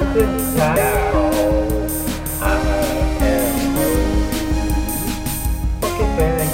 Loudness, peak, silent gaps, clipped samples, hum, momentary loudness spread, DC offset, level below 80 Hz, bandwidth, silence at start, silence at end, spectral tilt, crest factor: -19 LUFS; -4 dBFS; none; under 0.1%; none; 5 LU; 0.2%; -22 dBFS; 16.5 kHz; 0 s; 0 s; -5.5 dB/octave; 14 dB